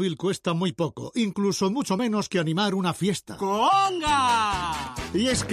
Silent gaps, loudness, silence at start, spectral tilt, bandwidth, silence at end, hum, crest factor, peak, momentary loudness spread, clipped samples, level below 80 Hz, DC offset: none; -25 LUFS; 0 s; -4.5 dB/octave; 15 kHz; 0 s; none; 12 dB; -12 dBFS; 8 LU; under 0.1%; -48 dBFS; under 0.1%